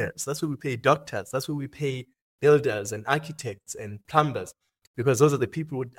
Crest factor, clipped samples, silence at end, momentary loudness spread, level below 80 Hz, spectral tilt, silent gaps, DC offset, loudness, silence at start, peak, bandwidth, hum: 24 dB; under 0.1%; 0.1 s; 16 LU; -64 dBFS; -5.5 dB/octave; 2.21-2.39 s, 4.87-4.94 s; under 0.1%; -26 LUFS; 0 s; -2 dBFS; 17 kHz; none